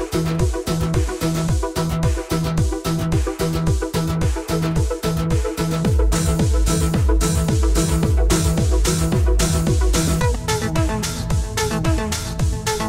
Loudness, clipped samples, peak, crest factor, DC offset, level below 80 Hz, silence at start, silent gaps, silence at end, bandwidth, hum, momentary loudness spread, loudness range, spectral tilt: -20 LUFS; under 0.1%; -4 dBFS; 14 dB; 0.2%; -22 dBFS; 0 s; none; 0 s; 16.5 kHz; none; 4 LU; 3 LU; -5.5 dB/octave